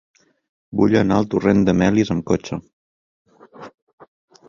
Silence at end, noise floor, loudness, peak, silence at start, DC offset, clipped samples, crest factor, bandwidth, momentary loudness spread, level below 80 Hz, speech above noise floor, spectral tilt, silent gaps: 0.8 s; under -90 dBFS; -18 LUFS; -2 dBFS; 0.7 s; under 0.1%; under 0.1%; 18 dB; 7.4 kHz; 12 LU; -46 dBFS; over 73 dB; -7 dB/octave; 2.73-3.25 s